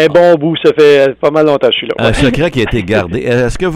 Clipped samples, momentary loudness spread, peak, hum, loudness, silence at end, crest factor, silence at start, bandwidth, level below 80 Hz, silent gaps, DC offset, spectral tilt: under 0.1%; 6 LU; 0 dBFS; none; -10 LUFS; 0 s; 8 dB; 0 s; 12.5 kHz; -28 dBFS; none; under 0.1%; -6 dB/octave